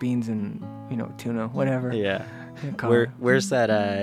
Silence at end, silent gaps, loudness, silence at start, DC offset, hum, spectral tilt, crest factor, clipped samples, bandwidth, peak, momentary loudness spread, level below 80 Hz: 0 s; none; -25 LUFS; 0 s; under 0.1%; none; -6 dB/octave; 18 dB; under 0.1%; 14.5 kHz; -6 dBFS; 12 LU; -66 dBFS